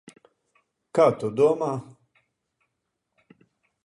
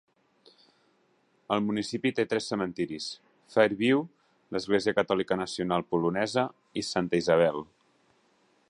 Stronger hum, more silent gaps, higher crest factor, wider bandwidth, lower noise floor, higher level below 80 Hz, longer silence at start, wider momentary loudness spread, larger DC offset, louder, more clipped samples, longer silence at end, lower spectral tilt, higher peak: neither; neither; about the same, 22 dB vs 22 dB; about the same, 11 kHz vs 11 kHz; first, -80 dBFS vs -68 dBFS; second, -72 dBFS vs -64 dBFS; second, 0.95 s vs 1.5 s; second, 9 LU vs 12 LU; neither; first, -23 LUFS vs -28 LUFS; neither; first, 2 s vs 1.05 s; first, -7 dB/octave vs -5 dB/octave; about the same, -6 dBFS vs -8 dBFS